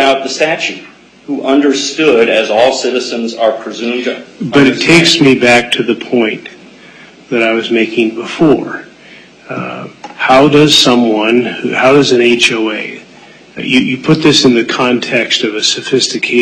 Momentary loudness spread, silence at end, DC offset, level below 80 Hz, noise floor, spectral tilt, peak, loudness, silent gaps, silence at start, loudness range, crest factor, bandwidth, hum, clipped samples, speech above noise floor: 15 LU; 0 s; under 0.1%; -48 dBFS; -38 dBFS; -4 dB/octave; 0 dBFS; -10 LUFS; none; 0 s; 5 LU; 12 dB; 13.5 kHz; none; under 0.1%; 27 dB